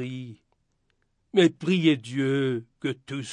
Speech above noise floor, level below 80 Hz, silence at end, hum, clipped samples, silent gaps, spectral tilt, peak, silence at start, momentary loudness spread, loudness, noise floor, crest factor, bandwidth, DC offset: 46 dB; -72 dBFS; 0 s; none; under 0.1%; none; -6 dB/octave; -8 dBFS; 0 s; 13 LU; -25 LUFS; -72 dBFS; 20 dB; 10.5 kHz; under 0.1%